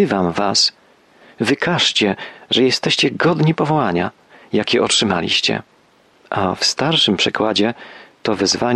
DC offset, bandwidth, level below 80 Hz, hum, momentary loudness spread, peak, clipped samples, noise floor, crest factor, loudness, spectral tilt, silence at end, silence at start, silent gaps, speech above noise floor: under 0.1%; 12.5 kHz; -54 dBFS; none; 8 LU; -4 dBFS; under 0.1%; -53 dBFS; 14 dB; -16 LUFS; -3.5 dB/octave; 0 s; 0 s; none; 36 dB